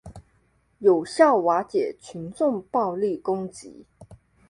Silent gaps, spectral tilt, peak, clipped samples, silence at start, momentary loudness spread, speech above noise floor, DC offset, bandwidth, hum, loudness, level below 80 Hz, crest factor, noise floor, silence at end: none; -6 dB/octave; -6 dBFS; under 0.1%; 0.05 s; 18 LU; 42 dB; under 0.1%; 11.5 kHz; none; -23 LUFS; -60 dBFS; 20 dB; -65 dBFS; 0.35 s